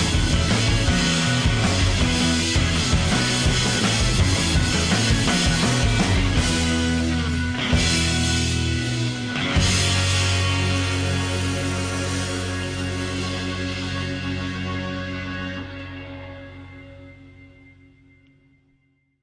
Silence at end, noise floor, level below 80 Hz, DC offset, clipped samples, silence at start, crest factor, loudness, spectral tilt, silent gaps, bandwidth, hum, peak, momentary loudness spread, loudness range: 1.75 s; -65 dBFS; -30 dBFS; under 0.1%; under 0.1%; 0 s; 14 dB; -21 LUFS; -4 dB/octave; none; 10.5 kHz; 60 Hz at -45 dBFS; -8 dBFS; 10 LU; 12 LU